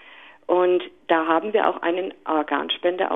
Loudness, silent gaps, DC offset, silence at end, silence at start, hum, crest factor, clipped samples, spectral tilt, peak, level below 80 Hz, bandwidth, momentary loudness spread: -22 LUFS; none; 0.1%; 0 s; 0.05 s; none; 18 dB; under 0.1%; -6.5 dB/octave; -4 dBFS; -68 dBFS; 3.9 kHz; 5 LU